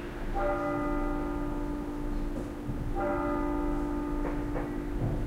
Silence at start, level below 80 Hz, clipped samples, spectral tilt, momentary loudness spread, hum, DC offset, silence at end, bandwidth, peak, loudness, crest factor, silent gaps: 0 s; -36 dBFS; under 0.1%; -8 dB/octave; 6 LU; none; under 0.1%; 0 s; 15 kHz; -18 dBFS; -33 LUFS; 12 dB; none